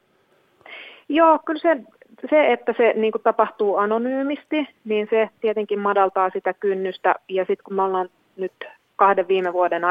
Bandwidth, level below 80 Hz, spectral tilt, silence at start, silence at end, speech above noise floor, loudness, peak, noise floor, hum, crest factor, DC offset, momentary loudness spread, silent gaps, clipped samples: 5 kHz; -72 dBFS; -7.5 dB/octave; 0.7 s; 0 s; 41 dB; -21 LUFS; -2 dBFS; -61 dBFS; none; 20 dB; under 0.1%; 14 LU; none; under 0.1%